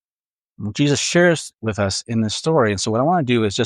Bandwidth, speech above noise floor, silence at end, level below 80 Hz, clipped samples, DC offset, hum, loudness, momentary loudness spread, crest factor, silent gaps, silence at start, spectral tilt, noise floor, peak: 12 kHz; over 72 dB; 0 s; -54 dBFS; under 0.1%; under 0.1%; none; -19 LUFS; 8 LU; 16 dB; none; 0.6 s; -4.5 dB/octave; under -90 dBFS; -4 dBFS